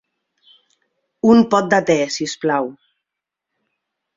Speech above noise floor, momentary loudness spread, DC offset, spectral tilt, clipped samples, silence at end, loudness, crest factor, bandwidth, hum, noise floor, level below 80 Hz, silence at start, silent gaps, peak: 68 dB; 9 LU; under 0.1%; -5 dB/octave; under 0.1%; 1.45 s; -16 LUFS; 18 dB; 7.8 kHz; none; -83 dBFS; -60 dBFS; 1.25 s; none; -2 dBFS